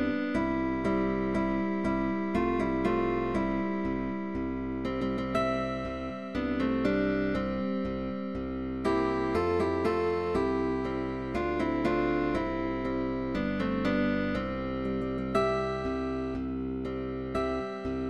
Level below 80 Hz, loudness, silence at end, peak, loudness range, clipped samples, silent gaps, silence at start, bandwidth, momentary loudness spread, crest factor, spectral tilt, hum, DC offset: -46 dBFS; -30 LUFS; 0 s; -14 dBFS; 2 LU; under 0.1%; none; 0 s; 11 kHz; 6 LU; 16 dB; -7.5 dB/octave; none; 0.3%